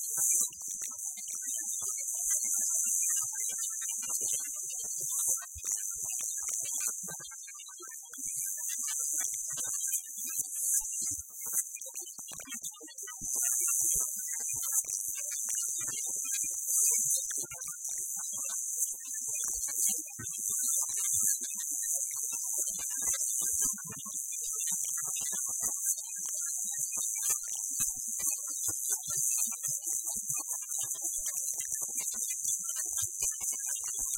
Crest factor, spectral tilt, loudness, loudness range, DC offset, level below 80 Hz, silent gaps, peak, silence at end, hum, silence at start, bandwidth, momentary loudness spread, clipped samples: 20 dB; 1 dB/octave; -31 LUFS; 3 LU; under 0.1%; -66 dBFS; none; -14 dBFS; 0 s; none; 0 s; 17 kHz; 9 LU; under 0.1%